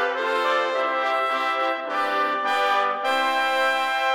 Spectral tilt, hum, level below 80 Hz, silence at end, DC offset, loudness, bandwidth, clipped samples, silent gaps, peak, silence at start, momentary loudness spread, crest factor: -1 dB/octave; none; -78 dBFS; 0 s; under 0.1%; -22 LUFS; 16.5 kHz; under 0.1%; none; -8 dBFS; 0 s; 3 LU; 14 dB